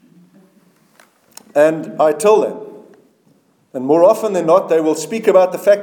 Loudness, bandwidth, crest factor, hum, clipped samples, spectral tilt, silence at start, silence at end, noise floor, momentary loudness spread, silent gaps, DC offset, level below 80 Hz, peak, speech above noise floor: -14 LUFS; 19 kHz; 16 dB; none; under 0.1%; -5 dB/octave; 1.55 s; 0 s; -56 dBFS; 13 LU; none; under 0.1%; -70 dBFS; 0 dBFS; 42 dB